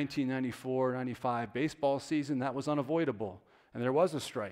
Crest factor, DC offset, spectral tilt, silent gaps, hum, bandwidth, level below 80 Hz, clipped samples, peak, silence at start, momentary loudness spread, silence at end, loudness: 18 dB; under 0.1%; -6.5 dB/octave; none; none; 15.5 kHz; -72 dBFS; under 0.1%; -16 dBFS; 0 s; 7 LU; 0 s; -33 LUFS